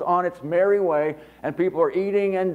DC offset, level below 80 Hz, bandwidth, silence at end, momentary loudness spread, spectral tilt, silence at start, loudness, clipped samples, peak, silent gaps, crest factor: under 0.1%; -62 dBFS; 4.9 kHz; 0 s; 8 LU; -8.5 dB/octave; 0 s; -23 LUFS; under 0.1%; -8 dBFS; none; 14 dB